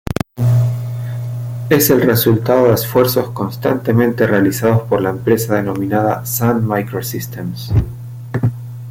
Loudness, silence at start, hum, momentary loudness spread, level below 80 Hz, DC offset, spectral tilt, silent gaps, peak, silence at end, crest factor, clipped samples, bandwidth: -16 LUFS; 0.05 s; none; 11 LU; -38 dBFS; under 0.1%; -6 dB/octave; none; 0 dBFS; 0 s; 16 dB; under 0.1%; 16.5 kHz